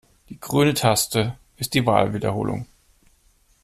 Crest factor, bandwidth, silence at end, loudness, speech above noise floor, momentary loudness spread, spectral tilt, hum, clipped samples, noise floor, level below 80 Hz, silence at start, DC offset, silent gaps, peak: 20 dB; 15.5 kHz; 1 s; -22 LUFS; 39 dB; 13 LU; -4.5 dB/octave; none; under 0.1%; -60 dBFS; -50 dBFS; 0.3 s; under 0.1%; none; -4 dBFS